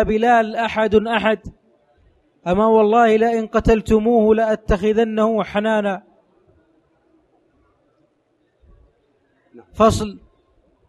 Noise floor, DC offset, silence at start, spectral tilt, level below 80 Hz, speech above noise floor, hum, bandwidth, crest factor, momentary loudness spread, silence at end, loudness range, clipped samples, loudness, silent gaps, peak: -64 dBFS; under 0.1%; 0 s; -6 dB/octave; -38 dBFS; 48 dB; none; 12 kHz; 18 dB; 9 LU; 0.7 s; 10 LU; under 0.1%; -17 LUFS; none; -2 dBFS